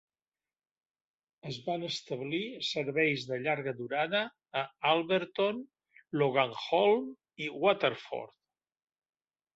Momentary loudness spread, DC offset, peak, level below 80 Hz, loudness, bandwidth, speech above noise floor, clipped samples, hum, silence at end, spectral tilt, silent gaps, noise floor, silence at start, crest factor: 12 LU; under 0.1%; -12 dBFS; -78 dBFS; -32 LUFS; 8 kHz; over 59 dB; under 0.1%; none; 1.3 s; -5 dB/octave; none; under -90 dBFS; 1.45 s; 22 dB